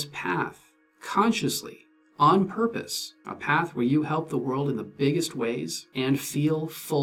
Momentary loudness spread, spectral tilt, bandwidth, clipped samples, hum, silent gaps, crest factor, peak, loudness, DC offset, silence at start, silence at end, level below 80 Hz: 9 LU; -5 dB/octave; 19 kHz; under 0.1%; none; none; 18 dB; -8 dBFS; -26 LUFS; under 0.1%; 0 s; 0 s; -68 dBFS